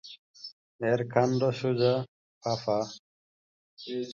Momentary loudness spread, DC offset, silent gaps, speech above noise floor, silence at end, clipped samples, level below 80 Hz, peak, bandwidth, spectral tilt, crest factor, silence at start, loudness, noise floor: 20 LU; under 0.1%; 0.19-0.34 s, 0.52-0.79 s, 2.08-2.41 s, 2.99-3.77 s; over 62 dB; 0 s; under 0.1%; -68 dBFS; -10 dBFS; 7.4 kHz; -6.5 dB/octave; 22 dB; 0.05 s; -29 LUFS; under -90 dBFS